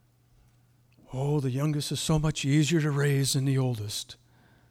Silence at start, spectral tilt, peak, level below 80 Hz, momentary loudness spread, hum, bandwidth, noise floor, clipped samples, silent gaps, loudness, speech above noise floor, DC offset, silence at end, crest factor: 1.1 s; -5.5 dB/octave; -14 dBFS; -50 dBFS; 10 LU; none; 16 kHz; -62 dBFS; under 0.1%; none; -27 LUFS; 36 dB; under 0.1%; 0.55 s; 16 dB